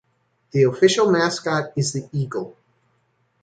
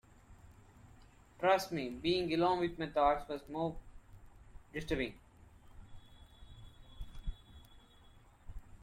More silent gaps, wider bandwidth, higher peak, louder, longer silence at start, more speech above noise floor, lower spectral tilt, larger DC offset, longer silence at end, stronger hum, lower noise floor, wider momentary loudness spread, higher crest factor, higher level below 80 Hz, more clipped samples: neither; second, 9.4 kHz vs 16 kHz; first, -4 dBFS vs -18 dBFS; first, -20 LUFS vs -35 LUFS; first, 0.55 s vs 0.3 s; first, 47 dB vs 27 dB; about the same, -5 dB/octave vs -5.5 dB/octave; neither; first, 0.9 s vs 0.1 s; neither; first, -66 dBFS vs -61 dBFS; second, 12 LU vs 26 LU; about the same, 18 dB vs 22 dB; second, -64 dBFS vs -54 dBFS; neither